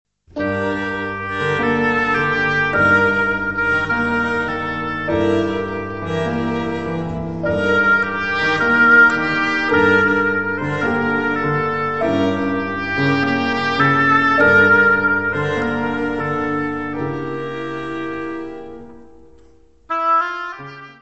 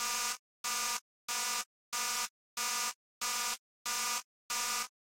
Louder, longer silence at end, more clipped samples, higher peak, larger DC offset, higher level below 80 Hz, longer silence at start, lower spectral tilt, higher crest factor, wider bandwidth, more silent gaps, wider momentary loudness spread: first, -17 LUFS vs -35 LUFS; second, 0 s vs 0.3 s; neither; first, -2 dBFS vs -20 dBFS; first, 0.8% vs under 0.1%; first, -46 dBFS vs -70 dBFS; first, 0.25 s vs 0 s; first, -6.5 dB/octave vs 3 dB/octave; about the same, 16 dB vs 18 dB; second, 8.4 kHz vs 16.5 kHz; second, none vs 0.39-0.64 s, 1.01-1.28 s, 1.66-1.92 s, 2.30-2.57 s, 2.95-3.21 s, 3.59-3.85 s, 4.24-4.49 s; first, 13 LU vs 6 LU